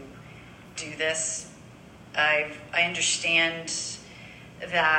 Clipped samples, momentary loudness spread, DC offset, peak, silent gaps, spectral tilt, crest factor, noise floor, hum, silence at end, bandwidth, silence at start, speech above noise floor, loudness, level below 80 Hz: under 0.1%; 23 LU; under 0.1%; -8 dBFS; none; -1 dB/octave; 20 dB; -48 dBFS; none; 0 s; 16 kHz; 0 s; 22 dB; -25 LUFS; -60 dBFS